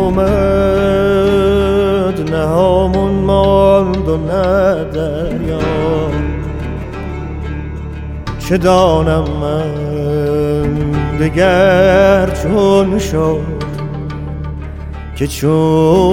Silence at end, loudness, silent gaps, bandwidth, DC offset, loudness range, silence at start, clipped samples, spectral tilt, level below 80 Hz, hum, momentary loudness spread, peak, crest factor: 0 s; -13 LUFS; none; 16.5 kHz; under 0.1%; 5 LU; 0 s; under 0.1%; -7 dB/octave; -24 dBFS; none; 14 LU; 0 dBFS; 12 dB